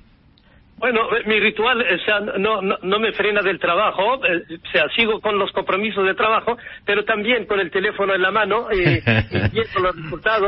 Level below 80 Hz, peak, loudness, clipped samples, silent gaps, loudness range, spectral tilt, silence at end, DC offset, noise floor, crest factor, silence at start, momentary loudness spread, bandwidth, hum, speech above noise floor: -44 dBFS; -2 dBFS; -19 LUFS; under 0.1%; none; 1 LU; -10 dB/octave; 0 s; under 0.1%; -52 dBFS; 18 dB; 0.8 s; 4 LU; 5.8 kHz; none; 33 dB